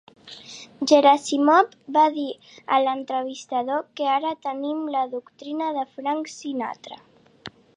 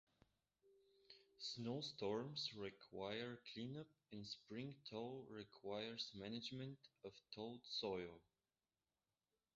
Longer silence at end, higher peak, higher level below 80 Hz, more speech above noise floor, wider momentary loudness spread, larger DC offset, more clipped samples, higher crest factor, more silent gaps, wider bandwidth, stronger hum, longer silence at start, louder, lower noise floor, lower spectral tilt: second, 0.3 s vs 1.35 s; first, -4 dBFS vs -32 dBFS; first, -76 dBFS vs -82 dBFS; second, 22 dB vs over 39 dB; first, 21 LU vs 12 LU; neither; neither; about the same, 20 dB vs 20 dB; neither; first, 10.5 kHz vs 7.6 kHz; neither; second, 0.25 s vs 0.65 s; first, -23 LUFS vs -51 LUFS; second, -45 dBFS vs under -90 dBFS; about the same, -3 dB/octave vs -3.5 dB/octave